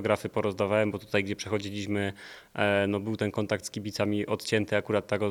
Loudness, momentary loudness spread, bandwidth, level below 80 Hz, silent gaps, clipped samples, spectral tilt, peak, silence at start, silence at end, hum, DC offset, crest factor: -29 LUFS; 6 LU; 18.5 kHz; -64 dBFS; none; under 0.1%; -5.5 dB/octave; -8 dBFS; 0 s; 0 s; none; under 0.1%; 20 dB